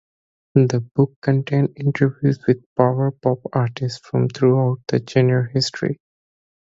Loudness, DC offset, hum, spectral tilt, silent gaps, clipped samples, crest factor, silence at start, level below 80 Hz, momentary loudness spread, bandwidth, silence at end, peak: -20 LUFS; under 0.1%; none; -7.5 dB/octave; 0.91-0.95 s, 1.16-1.22 s, 2.66-2.76 s; under 0.1%; 20 dB; 0.55 s; -58 dBFS; 6 LU; 7.8 kHz; 0.8 s; 0 dBFS